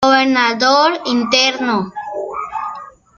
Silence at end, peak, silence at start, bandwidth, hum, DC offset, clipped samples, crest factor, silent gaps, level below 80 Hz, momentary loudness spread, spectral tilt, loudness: 0.3 s; 0 dBFS; 0 s; 7.4 kHz; none; under 0.1%; under 0.1%; 16 dB; none; -56 dBFS; 13 LU; -3 dB/octave; -15 LUFS